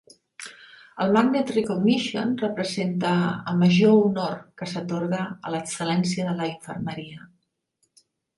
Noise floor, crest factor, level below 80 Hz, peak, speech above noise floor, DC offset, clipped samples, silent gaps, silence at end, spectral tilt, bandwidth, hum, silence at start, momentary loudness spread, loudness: -72 dBFS; 18 dB; -64 dBFS; -6 dBFS; 49 dB; under 0.1%; under 0.1%; none; 1.1 s; -6 dB/octave; 11.5 kHz; none; 0.4 s; 16 LU; -24 LUFS